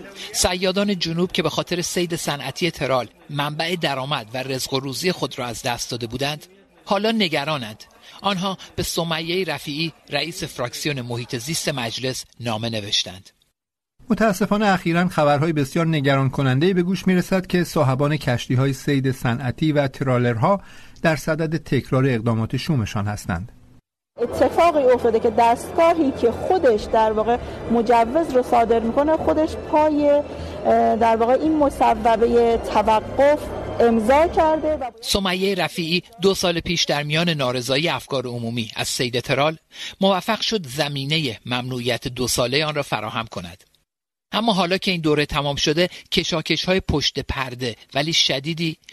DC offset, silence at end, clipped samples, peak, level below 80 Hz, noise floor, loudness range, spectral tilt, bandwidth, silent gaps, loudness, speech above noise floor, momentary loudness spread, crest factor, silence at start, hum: under 0.1%; 0.2 s; under 0.1%; -4 dBFS; -44 dBFS; -79 dBFS; 6 LU; -5 dB/octave; 13 kHz; none; -21 LUFS; 59 dB; 9 LU; 18 dB; 0 s; none